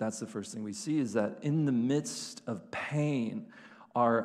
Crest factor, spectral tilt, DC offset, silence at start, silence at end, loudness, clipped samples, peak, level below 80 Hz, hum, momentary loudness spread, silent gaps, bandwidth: 18 dB; -6 dB/octave; under 0.1%; 0 s; 0 s; -33 LUFS; under 0.1%; -14 dBFS; -76 dBFS; none; 11 LU; none; 13 kHz